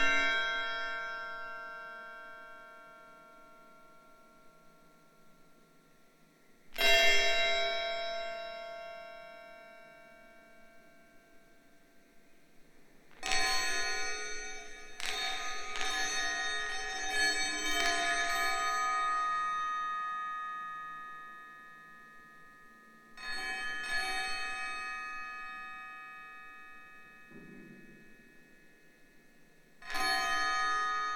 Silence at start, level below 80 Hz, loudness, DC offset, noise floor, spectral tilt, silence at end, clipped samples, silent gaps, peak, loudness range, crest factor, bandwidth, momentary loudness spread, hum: 0 s; -56 dBFS; -33 LUFS; under 0.1%; -64 dBFS; 0 dB/octave; 0 s; under 0.1%; none; -12 dBFS; 20 LU; 24 dB; 18.5 kHz; 23 LU; none